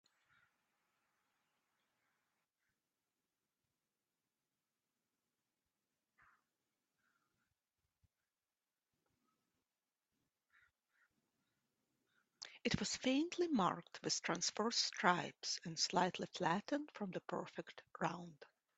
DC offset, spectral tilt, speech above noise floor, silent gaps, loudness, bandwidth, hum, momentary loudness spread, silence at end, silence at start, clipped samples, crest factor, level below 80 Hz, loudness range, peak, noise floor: under 0.1%; -3 dB/octave; over 49 dB; none; -40 LUFS; 8.2 kHz; none; 14 LU; 0.35 s; 12.4 s; under 0.1%; 28 dB; -78 dBFS; 6 LU; -16 dBFS; under -90 dBFS